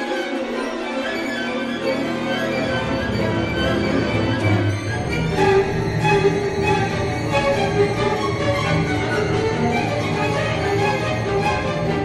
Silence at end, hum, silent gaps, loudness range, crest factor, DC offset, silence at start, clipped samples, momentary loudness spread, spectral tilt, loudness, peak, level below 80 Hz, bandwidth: 0 s; none; none; 3 LU; 16 dB; under 0.1%; 0 s; under 0.1%; 5 LU; -6 dB/octave; -20 LUFS; -4 dBFS; -38 dBFS; 13.5 kHz